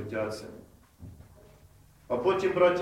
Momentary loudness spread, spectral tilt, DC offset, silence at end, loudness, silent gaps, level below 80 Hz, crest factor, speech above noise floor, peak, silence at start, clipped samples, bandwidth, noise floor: 27 LU; -6 dB/octave; under 0.1%; 0 s; -28 LUFS; none; -60 dBFS; 20 dB; 30 dB; -10 dBFS; 0 s; under 0.1%; 14 kHz; -57 dBFS